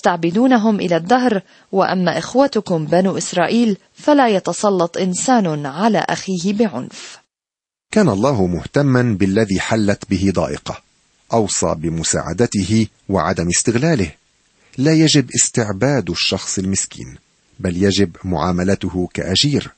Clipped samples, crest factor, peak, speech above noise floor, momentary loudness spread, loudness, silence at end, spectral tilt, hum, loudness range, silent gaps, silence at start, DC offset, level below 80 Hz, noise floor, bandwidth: under 0.1%; 16 dB; 0 dBFS; 73 dB; 8 LU; -17 LUFS; 0.1 s; -4.5 dB/octave; none; 3 LU; none; 0.05 s; under 0.1%; -46 dBFS; -89 dBFS; 8.8 kHz